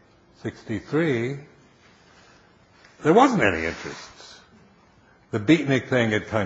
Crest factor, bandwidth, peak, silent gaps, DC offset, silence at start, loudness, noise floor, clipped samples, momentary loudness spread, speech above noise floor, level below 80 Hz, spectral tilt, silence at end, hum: 22 dB; 8 kHz; -2 dBFS; none; under 0.1%; 0.45 s; -22 LUFS; -56 dBFS; under 0.1%; 20 LU; 34 dB; -56 dBFS; -6 dB/octave; 0 s; none